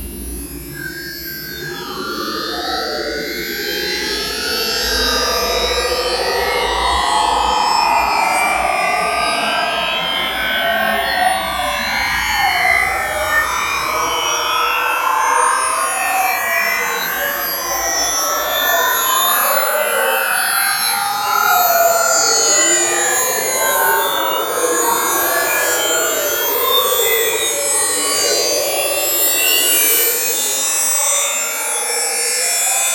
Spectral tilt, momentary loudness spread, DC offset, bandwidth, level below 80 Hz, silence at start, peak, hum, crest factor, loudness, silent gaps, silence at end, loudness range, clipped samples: 0 dB/octave; 8 LU; under 0.1%; 16.5 kHz; -40 dBFS; 0 s; -2 dBFS; none; 16 dB; -15 LUFS; none; 0 s; 4 LU; under 0.1%